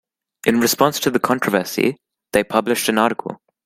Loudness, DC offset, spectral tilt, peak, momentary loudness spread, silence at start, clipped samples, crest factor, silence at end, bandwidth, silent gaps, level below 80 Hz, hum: -18 LUFS; under 0.1%; -3.5 dB/octave; 0 dBFS; 6 LU; 0.45 s; under 0.1%; 20 dB; 0.3 s; 16.5 kHz; none; -56 dBFS; none